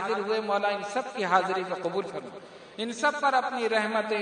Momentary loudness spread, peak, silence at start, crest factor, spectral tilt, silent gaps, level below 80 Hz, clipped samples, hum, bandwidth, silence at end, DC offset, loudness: 13 LU; -8 dBFS; 0 s; 20 dB; -4 dB/octave; none; -76 dBFS; under 0.1%; none; 10.5 kHz; 0 s; under 0.1%; -28 LUFS